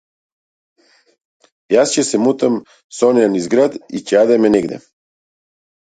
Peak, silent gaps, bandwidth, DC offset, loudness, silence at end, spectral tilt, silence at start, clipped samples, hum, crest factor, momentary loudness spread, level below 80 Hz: 0 dBFS; 2.84-2.90 s; 9.4 kHz; under 0.1%; -15 LUFS; 1.1 s; -4.5 dB/octave; 1.7 s; under 0.1%; none; 16 dB; 13 LU; -58 dBFS